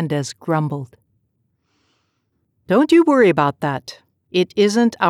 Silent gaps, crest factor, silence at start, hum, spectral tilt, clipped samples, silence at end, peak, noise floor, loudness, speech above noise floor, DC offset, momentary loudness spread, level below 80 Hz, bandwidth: none; 14 dB; 0 s; none; -6 dB/octave; under 0.1%; 0 s; -4 dBFS; -69 dBFS; -17 LUFS; 53 dB; under 0.1%; 16 LU; -64 dBFS; 13 kHz